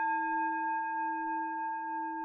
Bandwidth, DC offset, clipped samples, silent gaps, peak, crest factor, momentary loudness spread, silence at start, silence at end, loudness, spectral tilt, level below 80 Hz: 3.7 kHz; under 0.1%; under 0.1%; none; -24 dBFS; 10 dB; 5 LU; 0 s; 0 s; -34 LUFS; 8 dB/octave; -88 dBFS